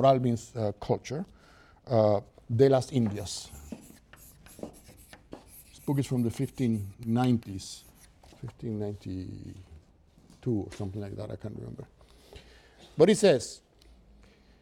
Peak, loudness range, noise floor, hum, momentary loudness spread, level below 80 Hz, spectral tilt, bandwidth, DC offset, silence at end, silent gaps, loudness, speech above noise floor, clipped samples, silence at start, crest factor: -8 dBFS; 10 LU; -60 dBFS; none; 23 LU; -58 dBFS; -6.5 dB/octave; 15.5 kHz; under 0.1%; 1.05 s; none; -29 LUFS; 31 dB; under 0.1%; 0 s; 22 dB